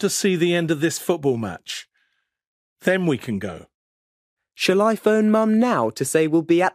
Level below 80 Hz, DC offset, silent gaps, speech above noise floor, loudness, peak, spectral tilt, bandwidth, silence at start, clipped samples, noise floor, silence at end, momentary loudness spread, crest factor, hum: -64 dBFS; under 0.1%; 2.47-2.76 s, 3.74-4.37 s; 50 dB; -20 LUFS; -4 dBFS; -5 dB/octave; 15.5 kHz; 0 s; under 0.1%; -70 dBFS; 0.05 s; 12 LU; 16 dB; none